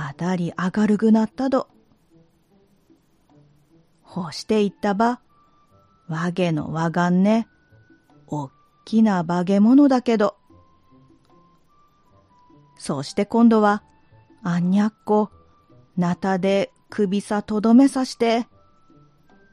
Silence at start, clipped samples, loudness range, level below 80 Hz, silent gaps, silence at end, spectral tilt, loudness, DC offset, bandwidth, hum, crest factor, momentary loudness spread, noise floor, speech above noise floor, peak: 0 s; under 0.1%; 6 LU; -60 dBFS; none; 1.1 s; -7 dB/octave; -21 LUFS; under 0.1%; 11 kHz; none; 18 dB; 16 LU; -59 dBFS; 40 dB; -4 dBFS